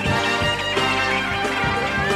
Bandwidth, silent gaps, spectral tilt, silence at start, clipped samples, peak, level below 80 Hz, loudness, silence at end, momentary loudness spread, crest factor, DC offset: 15 kHz; none; -4 dB/octave; 0 s; under 0.1%; -8 dBFS; -40 dBFS; -20 LUFS; 0 s; 2 LU; 14 dB; under 0.1%